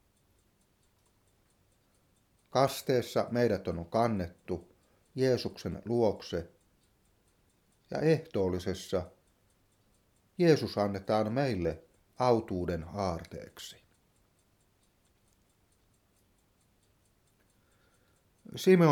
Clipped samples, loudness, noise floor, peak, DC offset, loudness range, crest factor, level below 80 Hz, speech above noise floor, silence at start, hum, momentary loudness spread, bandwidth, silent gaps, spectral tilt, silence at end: under 0.1%; -31 LUFS; -70 dBFS; -12 dBFS; under 0.1%; 5 LU; 22 dB; -60 dBFS; 40 dB; 2.55 s; none; 17 LU; 17.5 kHz; none; -6.5 dB/octave; 0 s